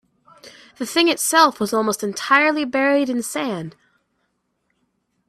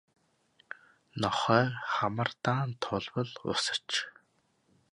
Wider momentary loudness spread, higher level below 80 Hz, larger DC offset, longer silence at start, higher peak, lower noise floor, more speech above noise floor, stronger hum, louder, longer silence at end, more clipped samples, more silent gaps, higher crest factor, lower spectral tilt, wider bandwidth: second, 11 LU vs 20 LU; about the same, -68 dBFS vs -66 dBFS; neither; second, 0.45 s vs 0.7 s; first, 0 dBFS vs -10 dBFS; about the same, -71 dBFS vs -72 dBFS; first, 52 dB vs 41 dB; neither; first, -18 LUFS vs -31 LUFS; first, 1.6 s vs 0.85 s; neither; neither; about the same, 20 dB vs 22 dB; second, -2.5 dB/octave vs -4.5 dB/octave; first, 16 kHz vs 11.5 kHz